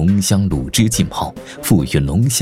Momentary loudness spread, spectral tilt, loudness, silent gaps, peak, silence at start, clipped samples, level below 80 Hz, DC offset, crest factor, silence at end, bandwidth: 9 LU; -5 dB/octave; -16 LUFS; none; -2 dBFS; 0 s; under 0.1%; -32 dBFS; under 0.1%; 14 dB; 0 s; 16.5 kHz